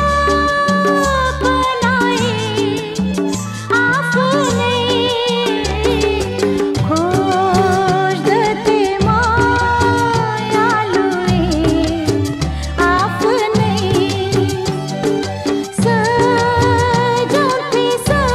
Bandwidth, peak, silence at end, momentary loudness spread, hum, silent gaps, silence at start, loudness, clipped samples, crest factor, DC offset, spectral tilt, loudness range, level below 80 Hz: 15 kHz; -2 dBFS; 0 s; 5 LU; none; none; 0 s; -15 LUFS; under 0.1%; 12 dB; under 0.1%; -5 dB/octave; 2 LU; -30 dBFS